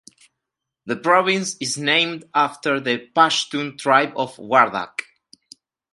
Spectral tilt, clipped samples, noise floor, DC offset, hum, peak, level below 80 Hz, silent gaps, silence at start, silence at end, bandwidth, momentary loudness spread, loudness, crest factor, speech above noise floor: -3 dB/octave; under 0.1%; -83 dBFS; under 0.1%; none; 0 dBFS; -70 dBFS; none; 0.85 s; 0.9 s; 11.5 kHz; 10 LU; -19 LUFS; 22 dB; 63 dB